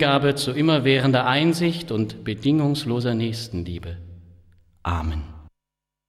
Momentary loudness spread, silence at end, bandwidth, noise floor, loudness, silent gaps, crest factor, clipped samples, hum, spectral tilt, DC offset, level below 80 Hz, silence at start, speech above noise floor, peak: 15 LU; 0.6 s; 14 kHz; -86 dBFS; -22 LUFS; none; 16 dB; under 0.1%; none; -6 dB/octave; under 0.1%; -40 dBFS; 0 s; 64 dB; -6 dBFS